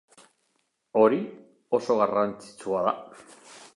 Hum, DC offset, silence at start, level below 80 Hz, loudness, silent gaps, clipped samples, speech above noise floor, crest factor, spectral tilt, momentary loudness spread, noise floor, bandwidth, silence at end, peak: none; under 0.1%; 0.95 s; -74 dBFS; -26 LUFS; none; under 0.1%; 49 dB; 20 dB; -6 dB/octave; 17 LU; -74 dBFS; 11.5 kHz; 0.2 s; -8 dBFS